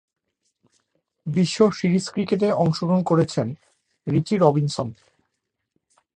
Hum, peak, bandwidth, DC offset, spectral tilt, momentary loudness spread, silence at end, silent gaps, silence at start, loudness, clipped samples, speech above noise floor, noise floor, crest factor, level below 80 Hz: none; -2 dBFS; 10 kHz; under 0.1%; -7 dB/octave; 13 LU; 1.25 s; none; 1.25 s; -22 LUFS; under 0.1%; 58 dB; -79 dBFS; 20 dB; -58 dBFS